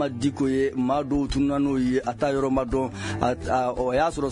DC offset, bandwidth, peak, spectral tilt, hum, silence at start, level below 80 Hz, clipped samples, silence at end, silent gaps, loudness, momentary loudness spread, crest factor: under 0.1%; 11 kHz; -6 dBFS; -6.5 dB/octave; none; 0 s; -42 dBFS; under 0.1%; 0 s; none; -25 LUFS; 3 LU; 18 dB